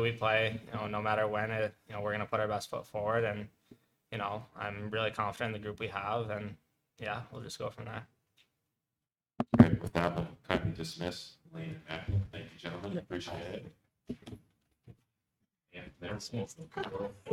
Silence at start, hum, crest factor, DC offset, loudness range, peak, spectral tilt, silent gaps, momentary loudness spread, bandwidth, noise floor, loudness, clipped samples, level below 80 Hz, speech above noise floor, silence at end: 0 s; none; 30 dB; under 0.1%; 13 LU; -6 dBFS; -6.5 dB/octave; none; 15 LU; 14 kHz; under -90 dBFS; -35 LUFS; under 0.1%; -58 dBFS; over 55 dB; 0 s